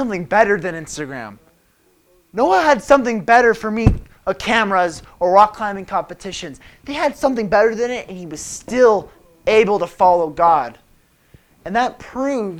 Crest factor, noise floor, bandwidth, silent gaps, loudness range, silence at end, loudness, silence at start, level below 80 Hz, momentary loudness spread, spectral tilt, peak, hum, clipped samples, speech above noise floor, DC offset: 18 dB; -58 dBFS; 16 kHz; none; 3 LU; 0 s; -17 LUFS; 0 s; -36 dBFS; 16 LU; -5 dB/octave; 0 dBFS; none; under 0.1%; 41 dB; under 0.1%